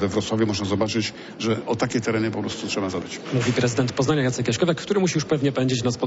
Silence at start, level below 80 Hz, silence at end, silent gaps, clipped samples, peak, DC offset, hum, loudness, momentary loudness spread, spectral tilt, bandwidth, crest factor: 0 s; -54 dBFS; 0 s; none; under 0.1%; -8 dBFS; under 0.1%; none; -23 LUFS; 5 LU; -5 dB/octave; 8 kHz; 14 dB